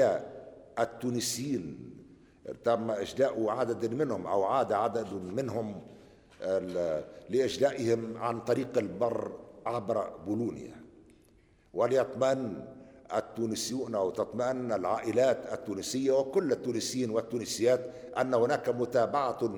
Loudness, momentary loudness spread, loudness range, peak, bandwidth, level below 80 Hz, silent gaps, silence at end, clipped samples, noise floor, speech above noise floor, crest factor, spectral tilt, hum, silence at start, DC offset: -31 LUFS; 11 LU; 4 LU; -14 dBFS; over 20 kHz; -66 dBFS; none; 0 s; under 0.1%; -63 dBFS; 32 dB; 18 dB; -5 dB/octave; none; 0 s; under 0.1%